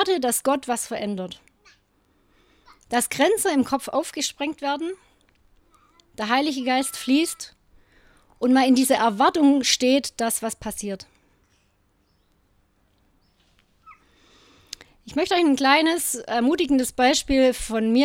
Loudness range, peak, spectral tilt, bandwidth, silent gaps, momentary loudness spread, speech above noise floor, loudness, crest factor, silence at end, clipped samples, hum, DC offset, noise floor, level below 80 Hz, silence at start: 8 LU; -4 dBFS; -2.5 dB/octave; 16.5 kHz; none; 15 LU; 44 dB; -22 LUFS; 20 dB; 0 s; under 0.1%; none; under 0.1%; -65 dBFS; -52 dBFS; 0 s